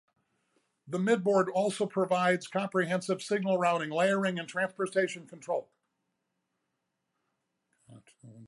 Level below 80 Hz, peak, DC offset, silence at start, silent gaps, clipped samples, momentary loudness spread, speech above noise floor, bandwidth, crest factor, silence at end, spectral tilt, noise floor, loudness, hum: -82 dBFS; -14 dBFS; under 0.1%; 0.85 s; none; under 0.1%; 9 LU; 53 dB; 11.5 kHz; 18 dB; 0 s; -5.5 dB/octave; -83 dBFS; -30 LUFS; none